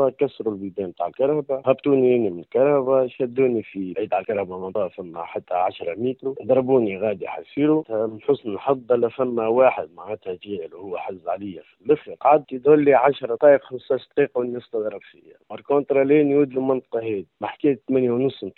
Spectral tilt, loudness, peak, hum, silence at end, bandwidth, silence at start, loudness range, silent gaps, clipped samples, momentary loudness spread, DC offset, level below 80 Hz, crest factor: -6 dB/octave; -22 LUFS; -2 dBFS; none; 0.1 s; 4.2 kHz; 0 s; 5 LU; none; under 0.1%; 14 LU; under 0.1%; -66 dBFS; 18 dB